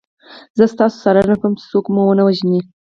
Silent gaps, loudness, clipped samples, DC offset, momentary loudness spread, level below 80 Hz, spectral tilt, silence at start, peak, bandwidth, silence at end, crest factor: 0.50-0.55 s; -15 LUFS; under 0.1%; under 0.1%; 5 LU; -50 dBFS; -8 dB/octave; 0.3 s; 0 dBFS; 7.2 kHz; 0.25 s; 14 dB